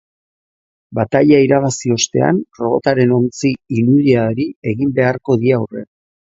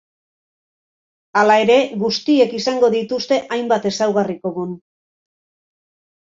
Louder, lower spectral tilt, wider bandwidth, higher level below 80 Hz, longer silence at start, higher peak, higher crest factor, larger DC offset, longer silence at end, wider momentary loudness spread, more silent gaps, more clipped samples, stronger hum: about the same, -15 LUFS vs -17 LUFS; first, -6 dB/octave vs -4.5 dB/octave; about the same, 8 kHz vs 7.8 kHz; first, -52 dBFS vs -64 dBFS; second, 0.9 s vs 1.35 s; about the same, 0 dBFS vs -2 dBFS; about the same, 16 dB vs 18 dB; neither; second, 0.35 s vs 1.5 s; about the same, 9 LU vs 11 LU; first, 4.56-4.62 s vs none; neither; neither